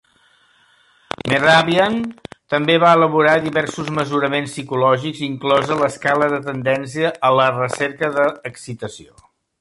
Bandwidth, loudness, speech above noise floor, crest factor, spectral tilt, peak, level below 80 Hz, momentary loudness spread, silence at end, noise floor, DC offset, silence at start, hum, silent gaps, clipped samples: 11.5 kHz; -17 LUFS; 39 dB; 16 dB; -5 dB/octave; -2 dBFS; -56 dBFS; 15 LU; 0.6 s; -56 dBFS; under 0.1%; 1.25 s; none; none; under 0.1%